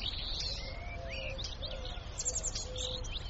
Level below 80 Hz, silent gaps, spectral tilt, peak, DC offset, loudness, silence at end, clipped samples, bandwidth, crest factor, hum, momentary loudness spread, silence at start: -42 dBFS; none; -2 dB/octave; -22 dBFS; under 0.1%; -38 LUFS; 0 s; under 0.1%; 8.2 kHz; 16 dB; none; 8 LU; 0 s